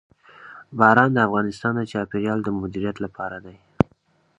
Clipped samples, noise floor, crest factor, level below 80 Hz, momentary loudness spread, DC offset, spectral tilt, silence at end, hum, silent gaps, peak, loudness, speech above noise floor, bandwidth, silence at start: under 0.1%; -62 dBFS; 22 dB; -50 dBFS; 16 LU; under 0.1%; -7.5 dB/octave; 0.55 s; none; none; 0 dBFS; -22 LUFS; 41 dB; 9.8 kHz; 0.4 s